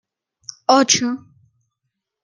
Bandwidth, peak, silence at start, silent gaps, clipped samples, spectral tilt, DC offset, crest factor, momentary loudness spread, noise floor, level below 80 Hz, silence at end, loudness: 11 kHz; 0 dBFS; 0.7 s; none; under 0.1%; -2 dB/octave; under 0.1%; 20 dB; 24 LU; -78 dBFS; -70 dBFS; 1.05 s; -16 LUFS